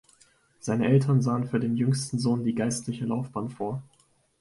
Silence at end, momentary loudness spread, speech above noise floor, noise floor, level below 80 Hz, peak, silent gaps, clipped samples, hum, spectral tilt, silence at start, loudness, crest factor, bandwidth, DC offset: 0.6 s; 12 LU; 36 dB; -62 dBFS; -64 dBFS; -10 dBFS; none; under 0.1%; none; -6.5 dB/octave; 0.65 s; -27 LUFS; 18 dB; 11.5 kHz; under 0.1%